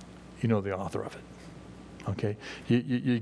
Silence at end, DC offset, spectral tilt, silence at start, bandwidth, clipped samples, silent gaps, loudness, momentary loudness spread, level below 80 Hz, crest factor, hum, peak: 0 s; under 0.1%; -7.5 dB/octave; 0 s; 11 kHz; under 0.1%; none; -32 LUFS; 20 LU; -58 dBFS; 20 dB; none; -12 dBFS